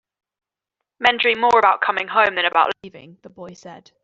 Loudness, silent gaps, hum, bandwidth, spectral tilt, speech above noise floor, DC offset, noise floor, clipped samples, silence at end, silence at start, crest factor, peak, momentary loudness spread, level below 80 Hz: -17 LUFS; none; none; 7.8 kHz; -3 dB/octave; 63 dB; under 0.1%; -83 dBFS; under 0.1%; 0.25 s; 1 s; 18 dB; -2 dBFS; 16 LU; -62 dBFS